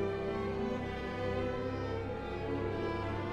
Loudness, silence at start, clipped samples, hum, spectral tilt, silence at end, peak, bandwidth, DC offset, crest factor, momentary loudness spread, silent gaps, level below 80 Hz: -37 LUFS; 0 s; under 0.1%; none; -7.5 dB/octave; 0 s; -22 dBFS; 9.2 kHz; under 0.1%; 14 dB; 3 LU; none; -50 dBFS